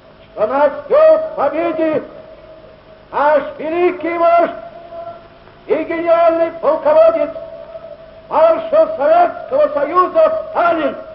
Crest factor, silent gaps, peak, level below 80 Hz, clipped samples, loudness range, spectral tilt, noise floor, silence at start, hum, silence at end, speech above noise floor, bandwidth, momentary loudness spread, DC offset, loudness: 14 dB; none; 0 dBFS; -52 dBFS; under 0.1%; 3 LU; -8.5 dB/octave; -41 dBFS; 0.35 s; none; 0 s; 27 dB; 5.6 kHz; 20 LU; under 0.1%; -14 LUFS